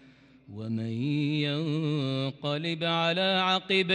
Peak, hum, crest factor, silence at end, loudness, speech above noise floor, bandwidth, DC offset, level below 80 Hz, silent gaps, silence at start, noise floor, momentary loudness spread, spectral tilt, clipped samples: -12 dBFS; none; 16 dB; 0 s; -28 LUFS; 27 dB; 10 kHz; under 0.1%; -74 dBFS; none; 0.5 s; -55 dBFS; 9 LU; -6 dB/octave; under 0.1%